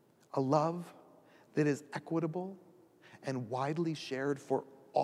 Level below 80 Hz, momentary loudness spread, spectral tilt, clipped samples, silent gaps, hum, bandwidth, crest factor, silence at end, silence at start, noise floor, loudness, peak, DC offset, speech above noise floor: -84 dBFS; 13 LU; -7 dB/octave; under 0.1%; none; none; 13.5 kHz; 22 dB; 0 s; 0.35 s; -61 dBFS; -36 LUFS; -14 dBFS; under 0.1%; 27 dB